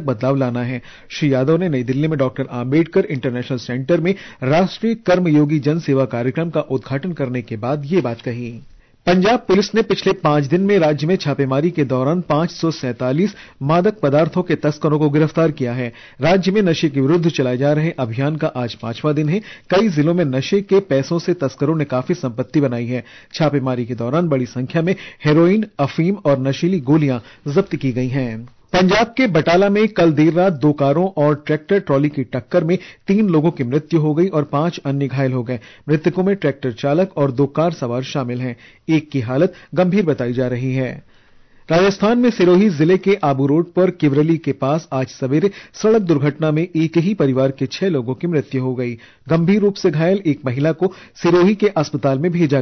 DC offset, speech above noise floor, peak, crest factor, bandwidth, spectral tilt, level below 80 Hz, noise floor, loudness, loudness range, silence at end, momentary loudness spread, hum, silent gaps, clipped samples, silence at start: under 0.1%; 31 dB; -6 dBFS; 12 dB; 6.4 kHz; -7.5 dB/octave; -52 dBFS; -47 dBFS; -17 LUFS; 4 LU; 0 s; 8 LU; none; none; under 0.1%; 0 s